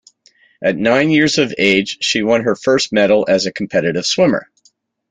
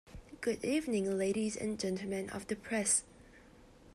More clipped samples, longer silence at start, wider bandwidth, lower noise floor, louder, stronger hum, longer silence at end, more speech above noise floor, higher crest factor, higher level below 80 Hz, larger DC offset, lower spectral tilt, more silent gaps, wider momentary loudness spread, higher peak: neither; first, 0.6 s vs 0.05 s; second, 9.4 kHz vs 13 kHz; about the same, -57 dBFS vs -59 dBFS; first, -15 LUFS vs -35 LUFS; neither; first, 0.65 s vs 0 s; first, 43 dB vs 24 dB; second, 14 dB vs 20 dB; first, -54 dBFS vs -62 dBFS; neither; about the same, -4 dB/octave vs -3.5 dB/octave; neither; second, 5 LU vs 9 LU; first, -2 dBFS vs -18 dBFS